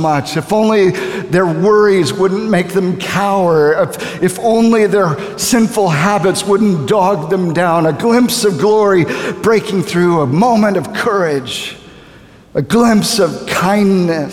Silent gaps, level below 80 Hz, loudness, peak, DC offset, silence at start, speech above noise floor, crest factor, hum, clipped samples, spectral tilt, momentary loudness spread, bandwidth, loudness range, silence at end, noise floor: none; -50 dBFS; -13 LUFS; 0 dBFS; 0.2%; 0 s; 28 dB; 12 dB; none; under 0.1%; -5.5 dB/octave; 6 LU; 17 kHz; 2 LU; 0 s; -40 dBFS